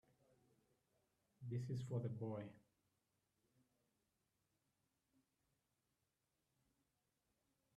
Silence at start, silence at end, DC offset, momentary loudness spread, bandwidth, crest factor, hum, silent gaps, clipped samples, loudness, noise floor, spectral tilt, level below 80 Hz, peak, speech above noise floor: 1.4 s; 5.2 s; under 0.1%; 11 LU; 10.5 kHz; 22 dB; none; none; under 0.1%; -48 LUFS; -89 dBFS; -8.5 dB/octave; -86 dBFS; -32 dBFS; 43 dB